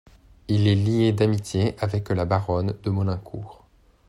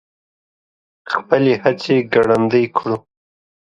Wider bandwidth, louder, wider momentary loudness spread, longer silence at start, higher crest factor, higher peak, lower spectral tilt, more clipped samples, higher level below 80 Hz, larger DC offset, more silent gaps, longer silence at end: first, 11.5 kHz vs 10 kHz; second, -23 LUFS vs -17 LUFS; about the same, 11 LU vs 9 LU; second, 0.5 s vs 1.05 s; about the same, 16 dB vs 18 dB; second, -8 dBFS vs 0 dBFS; about the same, -7.5 dB/octave vs -7 dB/octave; neither; first, -50 dBFS vs -58 dBFS; neither; neither; second, 0.55 s vs 0.8 s